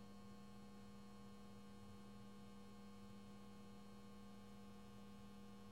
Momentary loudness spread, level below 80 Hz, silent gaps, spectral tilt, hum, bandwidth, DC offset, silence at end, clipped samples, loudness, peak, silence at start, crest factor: 1 LU; -74 dBFS; none; -6 dB/octave; 60 Hz at -75 dBFS; 16 kHz; under 0.1%; 0 s; under 0.1%; -61 LUFS; -48 dBFS; 0 s; 10 dB